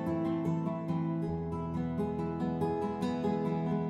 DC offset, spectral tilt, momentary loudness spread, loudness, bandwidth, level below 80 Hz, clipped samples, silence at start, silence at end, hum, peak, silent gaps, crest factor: under 0.1%; -9 dB/octave; 3 LU; -34 LUFS; 8 kHz; -60 dBFS; under 0.1%; 0 s; 0 s; none; -20 dBFS; none; 12 dB